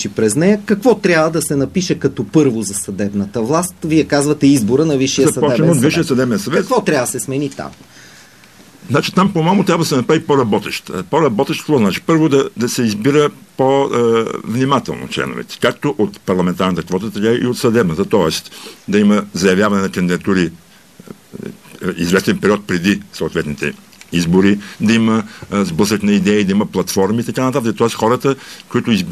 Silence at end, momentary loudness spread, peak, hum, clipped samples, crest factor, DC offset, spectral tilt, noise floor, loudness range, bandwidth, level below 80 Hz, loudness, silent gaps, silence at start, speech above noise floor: 0 s; 8 LU; 0 dBFS; none; under 0.1%; 14 dB; 0.2%; -5.5 dB/octave; -43 dBFS; 4 LU; 14 kHz; -48 dBFS; -15 LUFS; none; 0 s; 28 dB